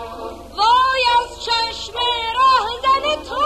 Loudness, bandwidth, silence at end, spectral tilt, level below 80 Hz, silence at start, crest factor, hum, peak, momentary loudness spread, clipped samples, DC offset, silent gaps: -17 LUFS; 13 kHz; 0 s; -1.5 dB/octave; -42 dBFS; 0 s; 14 dB; none; -4 dBFS; 9 LU; under 0.1%; under 0.1%; none